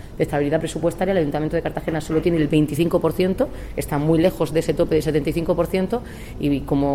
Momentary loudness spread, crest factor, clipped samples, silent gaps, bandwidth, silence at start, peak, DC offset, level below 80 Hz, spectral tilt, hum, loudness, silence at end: 7 LU; 16 dB; under 0.1%; none; 16.5 kHz; 0 s; -6 dBFS; under 0.1%; -36 dBFS; -7 dB/octave; none; -21 LUFS; 0 s